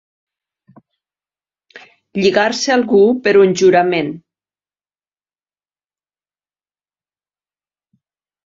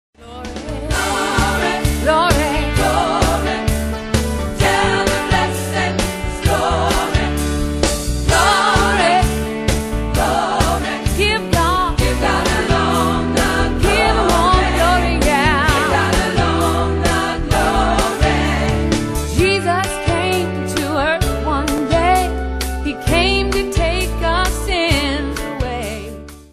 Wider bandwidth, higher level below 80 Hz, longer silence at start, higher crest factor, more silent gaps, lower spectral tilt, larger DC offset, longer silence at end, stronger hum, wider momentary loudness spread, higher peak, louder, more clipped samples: second, 7.8 kHz vs 14 kHz; second, -62 dBFS vs -24 dBFS; first, 1.75 s vs 0.2 s; about the same, 18 dB vs 16 dB; neither; about the same, -4.5 dB/octave vs -4.5 dB/octave; neither; first, 4.25 s vs 0.1 s; first, 50 Hz at -45 dBFS vs none; first, 13 LU vs 7 LU; about the same, -2 dBFS vs 0 dBFS; first, -13 LUFS vs -16 LUFS; neither